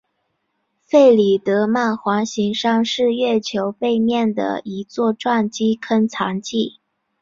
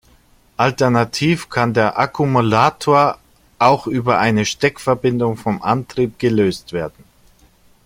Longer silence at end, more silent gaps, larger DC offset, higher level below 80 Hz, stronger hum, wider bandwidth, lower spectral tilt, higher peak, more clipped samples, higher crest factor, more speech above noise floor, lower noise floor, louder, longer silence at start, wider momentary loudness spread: second, 0.5 s vs 0.95 s; neither; neither; second, -62 dBFS vs -50 dBFS; neither; second, 7.6 kHz vs 16.5 kHz; about the same, -5 dB/octave vs -6 dB/octave; about the same, -2 dBFS vs 0 dBFS; neither; about the same, 16 dB vs 16 dB; first, 54 dB vs 36 dB; first, -71 dBFS vs -52 dBFS; about the same, -18 LUFS vs -17 LUFS; first, 0.95 s vs 0.6 s; first, 10 LU vs 7 LU